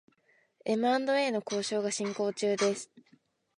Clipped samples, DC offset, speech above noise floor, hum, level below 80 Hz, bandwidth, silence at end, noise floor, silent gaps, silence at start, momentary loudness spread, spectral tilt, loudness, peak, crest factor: under 0.1%; under 0.1%; 39 dB; none; -84 dBFS; 11 kHz; 0.6 s; -69 dBFS; none; 0.65 s; 9 LU; -3.5 dB/octave; -30 LUFS; -16 dBFS; 16 dB